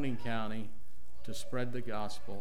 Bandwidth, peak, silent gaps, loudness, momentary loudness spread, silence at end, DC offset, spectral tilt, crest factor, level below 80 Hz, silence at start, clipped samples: 16 kHz; -22 dBFS; none; -40 LUFS; 10 LU; 0 s; 3%; -5.5 dB/octave; 18 dB; -60 dBFS; 0 s; under 0.1%